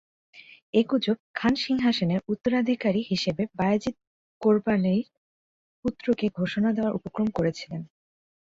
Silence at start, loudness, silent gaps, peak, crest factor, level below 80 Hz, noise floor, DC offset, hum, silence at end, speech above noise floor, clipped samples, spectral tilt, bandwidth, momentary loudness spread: 0.35 s; -26 LUFS; 0.62-0.73 s, 1.20-1.34 s, 4.07-4.41 s, 5.17-5.83 s; -8 dBFS; 18 dB; -58 dBFS; under -90 dBFS; under 0.1%; none; 0.6 s; over 65 dB; under 0.1%; -6.5 dB/octave; 7.8 kHz; 8 LU